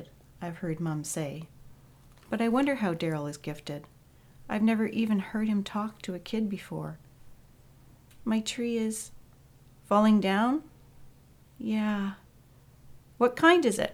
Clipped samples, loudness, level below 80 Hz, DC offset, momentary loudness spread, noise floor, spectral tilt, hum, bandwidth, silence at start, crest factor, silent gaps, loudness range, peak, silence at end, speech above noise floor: under 0.1%; -29 LUFS; -60 dBFS; under 0.1%; 17 LU; -57 dBFS; -5.5 dB/octave; none; 15.5 kHz; 0 s; 22 dB; none; 6 LU; -8 dBFS; 0 s; 29 dB